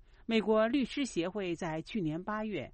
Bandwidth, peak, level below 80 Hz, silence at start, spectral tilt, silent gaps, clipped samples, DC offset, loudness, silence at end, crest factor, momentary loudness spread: 8.4 kHz; -16 dBFS; -58 dBFS; 0.3 s; -5.5 dB/octave; none; under 0.1%; under 0.1%; -33 LUFS; 0.05 s; 18 dB; 8 LU